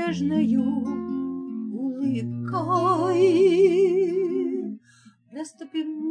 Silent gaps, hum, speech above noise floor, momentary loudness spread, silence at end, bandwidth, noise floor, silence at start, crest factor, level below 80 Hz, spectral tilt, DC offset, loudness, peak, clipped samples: none; none; 33 dB; 16 LU; 0 s; 10 kHz; -55 dBFS; 0 s; 14 dB; -68 dBFS; -7.5 dB/octave; under 0.1%; -23 LUFS; -8 dBFS; under 0.1%